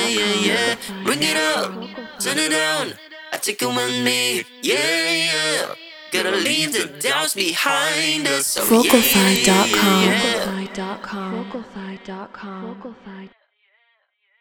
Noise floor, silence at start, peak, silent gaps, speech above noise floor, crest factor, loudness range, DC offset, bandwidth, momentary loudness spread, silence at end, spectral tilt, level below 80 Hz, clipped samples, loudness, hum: -65 dBFS; 0 s; 0 dBFS; none; 45 dB; 20 dB; 12 LU; under 0.1%; over 20 kHz; 19 LU; 1.15 s; -2.5 dB/octave; -56 dBFS; under 0.1%; -18 LUFS; none